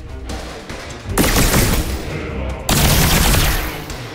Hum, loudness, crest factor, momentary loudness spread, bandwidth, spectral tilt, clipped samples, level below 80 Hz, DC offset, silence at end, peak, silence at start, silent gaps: none; -16 LUFS; 16 dB; 16 LU; 16.5 kHz; -3.5 dB/octave; under 0.1%; -22 dBFS; under 0.1%; 0 s; -2 dBFS; 0 s; none